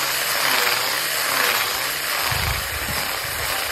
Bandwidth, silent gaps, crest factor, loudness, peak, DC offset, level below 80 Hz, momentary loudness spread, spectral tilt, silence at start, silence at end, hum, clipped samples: 16 kHz; none; 18 dB; -20 LUFS; -4 dBFS; under 0.1%; -40 dBFS; 5 LU; -1 dB/octave; 0 s; 0 s; none; under 0.1%